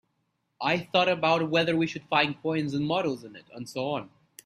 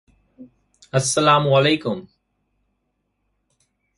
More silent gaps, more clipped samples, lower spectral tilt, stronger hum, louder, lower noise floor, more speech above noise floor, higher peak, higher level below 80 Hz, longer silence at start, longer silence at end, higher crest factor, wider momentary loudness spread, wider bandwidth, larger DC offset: neither; neither; first, -5.5 dB/octave vs -4 dB/octave; neither; second, -27 LUFS vs -18 LUFS; about the same, -76 dBFS vs -73 dBFS; second, 49 dB vs 55 dB; second, -8 dBFS vs -2 dBFS; second, -68 dBFS vs -60 dBFS; first, 0.6 s vs 0.4 s; second, 0.4 s vs 1.95 s; about the same, 20 dB vs 20 dB; about the same, 13 LU vs 12 LU; first, 15 kHz vs 11.5 kHz; neither